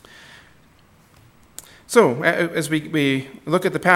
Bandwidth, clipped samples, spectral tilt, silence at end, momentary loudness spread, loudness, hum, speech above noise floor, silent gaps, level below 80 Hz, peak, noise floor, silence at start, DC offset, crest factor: 16.5 kHz; under 0.1%; -5 dB/octave; 0 s; 24 LU; -20 LUFS; none; 35 dB; none; -62 dBFS; 0 dBFS; -53 dBFS; 1.9 s; under 0.1%; 22 dB